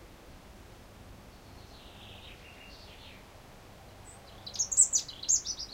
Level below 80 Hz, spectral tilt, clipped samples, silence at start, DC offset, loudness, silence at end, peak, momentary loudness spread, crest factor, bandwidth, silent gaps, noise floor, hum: -56 dBFS; 0 dB/octave; under 0.1%; 0 s; under 0.1%; -26 LUFS; 0 s; -10 dBFS; 28 LU; 26 dB; 16 kHz; none; -52 dBFS; none